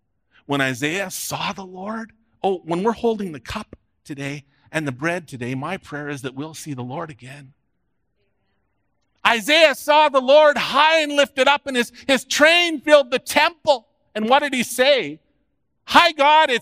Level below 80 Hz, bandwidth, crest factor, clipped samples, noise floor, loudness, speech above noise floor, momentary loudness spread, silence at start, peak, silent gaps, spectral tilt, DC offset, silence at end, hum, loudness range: -58 dBFS; 16 kHz; 20 dB; under 0.1%; -73 dBFS; -18 LUFS; 54 dB; 17 LU; 0.5 s; 0 dBFS; none; -3 dB/octave; under 0.1%; 0 s; none; 13 LU